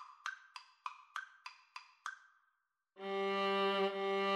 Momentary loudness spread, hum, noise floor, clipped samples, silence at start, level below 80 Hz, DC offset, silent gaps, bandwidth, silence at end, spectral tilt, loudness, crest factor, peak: 21 LU; none; -83 dBFS; under 0.1%; 0 s; under -90 dBFS; under 0.1%; none; 12 kHz; 0 s; -4.5 dB/octave; -39 LUFS; 16 dB; -24 dBFS